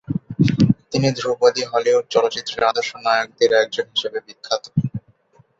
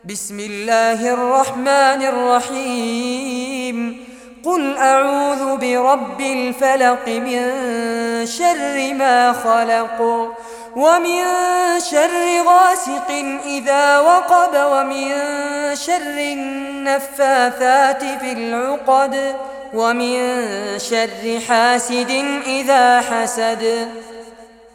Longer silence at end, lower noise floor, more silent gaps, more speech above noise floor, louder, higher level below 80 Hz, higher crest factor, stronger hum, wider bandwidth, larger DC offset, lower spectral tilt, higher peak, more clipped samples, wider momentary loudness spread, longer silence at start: first, 0.6 s vs 0.3 s; first, -56 dBFS vs -41 dBFS; neither; first, 36 dB vs 25 dB; second, -19 LUFS vs -16 LUFS; first, -50 dBFS vs -60 dBFS; about the same, 18 dB vs 14 dB; neither; second, 7.8 kHz vs 17.5 kHz; neither; first, -5.5 dB/octave vs -2 dB/octave; about the same, -2 dBFS vs -2 dBFS; neither; about the same, 9 LU vs 10 LU; about the same, 0.1 s vs 0.05 s